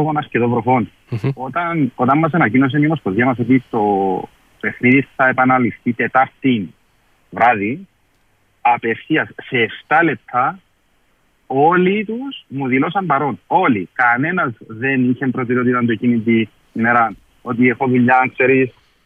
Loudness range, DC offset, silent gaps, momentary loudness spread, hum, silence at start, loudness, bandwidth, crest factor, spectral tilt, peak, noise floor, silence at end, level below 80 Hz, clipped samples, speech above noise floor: 3 LU; under 0.1%; none; 9 LU; none; 0 s; -16 LUFS; 4.5 kHz; 16 dB; -9 dB/octave; -2 dBFS; -59 dBFS; 0.35 s; -58 dBFS; under 0.1%; 43 dB